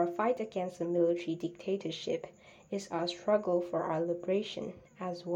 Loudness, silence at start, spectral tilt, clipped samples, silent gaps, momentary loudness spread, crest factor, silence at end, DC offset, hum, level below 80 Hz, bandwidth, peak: -34 LUFS; 0 s; -6 dB/octave; under 0.1%; none; 11 LU; 18 dB; 0 s; under 0.1%; none; -74 dBFS; 10 kHz; -16 dBFS